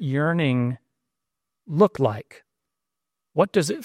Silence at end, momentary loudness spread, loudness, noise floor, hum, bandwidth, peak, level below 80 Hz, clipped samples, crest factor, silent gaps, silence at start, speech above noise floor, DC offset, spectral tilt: 0 s; 11 LU; -23 LUFS; -86 dBFS; none; 15.5 kHz; -6 dBFS; -64 dBFS; under 0.1%; 20 dB; none; 0 s; 64 dB; under 0.1%; -6.5 dB/octave